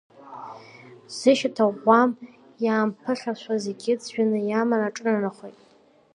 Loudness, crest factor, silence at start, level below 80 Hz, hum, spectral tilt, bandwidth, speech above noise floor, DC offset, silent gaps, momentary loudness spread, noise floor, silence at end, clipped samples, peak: -23 LUFS; 20 dB; 0.25 s; -80 dBFS; none; -5 dB/octave; 10.5 kHz; 35 dB; under 0.1%; none; 22 LU; -58 dBFS; 0.65 s; under 0.1%; -4 dBFS